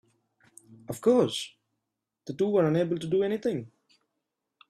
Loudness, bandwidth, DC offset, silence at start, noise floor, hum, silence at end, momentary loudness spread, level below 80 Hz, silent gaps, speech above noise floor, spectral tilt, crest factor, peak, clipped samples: -27 LUFS; 14 kHz; under 0.1%; 0.7 s; -85 dBFS; none; 1 s; 17 LU; -70 dBFS; none; 59 dB; -6 dB/octave; 18 dB; -12 dBFS; under 0.1%